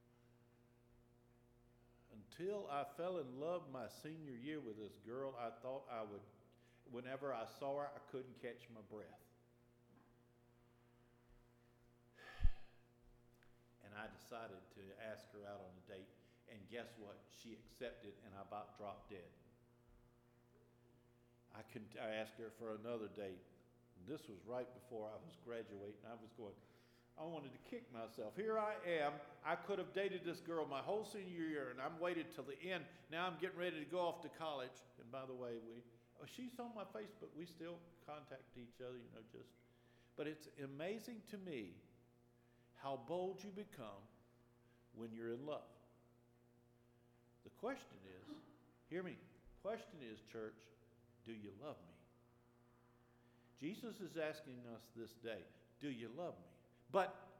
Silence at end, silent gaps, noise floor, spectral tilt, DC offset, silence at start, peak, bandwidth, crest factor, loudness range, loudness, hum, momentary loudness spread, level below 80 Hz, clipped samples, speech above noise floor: 0 s; none; -73 dBFS; -5.5 dB/octave; under 0.1%; 0.1 s; -24 dBFS; 17.5 kHz; 26 dB; 11 LU; -50 LUFS; none; 17 LU; -62 dBFS; under 0.1%; 24 dB